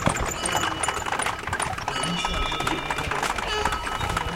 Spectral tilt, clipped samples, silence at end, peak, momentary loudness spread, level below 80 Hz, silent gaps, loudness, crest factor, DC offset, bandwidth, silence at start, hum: -3 dB/octave; under 0.1%; 0 s; -6 dBFS; 3 LU; -38 dBFS; none; -26 LUFS; 20 dB; under 0.1%; 17 kHz; 0 s; none